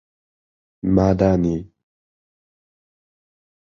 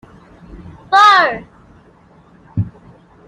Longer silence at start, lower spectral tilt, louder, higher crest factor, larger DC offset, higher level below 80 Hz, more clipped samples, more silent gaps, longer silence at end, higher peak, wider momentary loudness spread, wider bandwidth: first, 0.85 s vs 0.55 s; first, -9 dB/octave vs -4 dB/octave; second, -19 LUFS vs -12 LUFS; first, 22 dB vs 16 dB; neither; first, -40 dBFS vs -48 dBFS; neither; neither; first, 2.1 s vs 0.6 s; about the same, -2 dBFS vs 0 dBFS; second, 12 LU vs 19 LU; second, 7 kHz vs 11 kHz